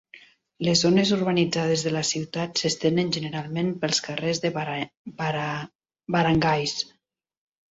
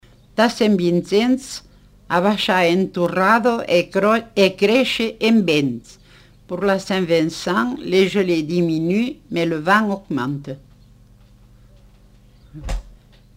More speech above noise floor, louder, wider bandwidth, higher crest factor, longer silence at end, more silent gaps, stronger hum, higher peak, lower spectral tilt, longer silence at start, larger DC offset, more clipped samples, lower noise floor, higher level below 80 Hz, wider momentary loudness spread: about the same, 28 dB vs 31 dB; second, -24 LUFS vs -18 LUFS; second, 8 kHz vs 16 kHz; about the same, 20 dB vs 18 dB; first, 0.9 s vs 0.45 s; first, 4.97-5.05 s, 5.75-5.79 s vs none; second, none vs 50 Hz at -45 dBFS; second, -6 dBFS vs -2 dBFS; about the same, -4.5 dB/octave vs -5.5 dB/octave; second, 0.15 s vs 0.35 s; neither; neither; about the same, -52 dBFS vs -49 dBFS; second, -58 dBFS vs -42 dBFS; second, 10 LU vs 15 LU